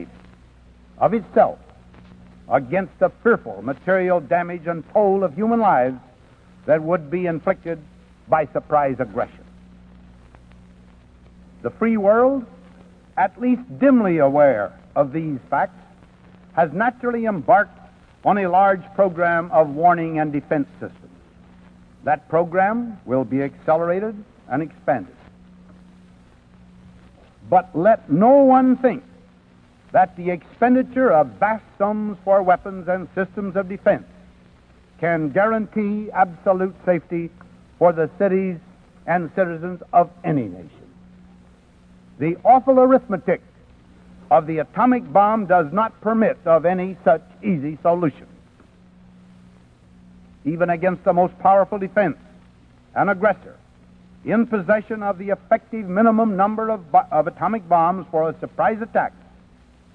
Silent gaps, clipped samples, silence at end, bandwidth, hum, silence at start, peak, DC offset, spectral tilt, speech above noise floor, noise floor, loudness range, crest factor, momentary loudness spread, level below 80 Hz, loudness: none; under 0.1%; 0.85 s; 4.8 kHz; none; 0 s; -4 dBFS; under 0.1%; -10 dB/octave; 33 dB; -51 dBFS; 6 LU; 18 dB; 11 LU; -54 dBFS; -20 LUFS